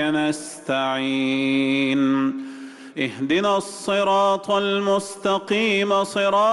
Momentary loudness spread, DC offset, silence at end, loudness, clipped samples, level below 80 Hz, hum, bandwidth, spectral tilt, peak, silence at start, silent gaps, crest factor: 8 LU; under 0.1%; 0 s; -21 LUFS; under 0.1%; -64 dBFS; none; 12 kHz; -4.5 dB/octave; -10 dBFS; 0 s; none; 12 dB